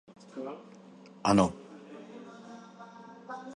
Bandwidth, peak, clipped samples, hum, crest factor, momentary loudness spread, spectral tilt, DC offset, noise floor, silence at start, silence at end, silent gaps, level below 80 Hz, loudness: 11.5 kHz; -10 dBFS; under 0.1%; none; 26 dB; 24 LU; -6 dB/octave; under 0.1%; -50 dBFS; 0.35 s; 0 s; none; -62 dBFS; -30 LUFS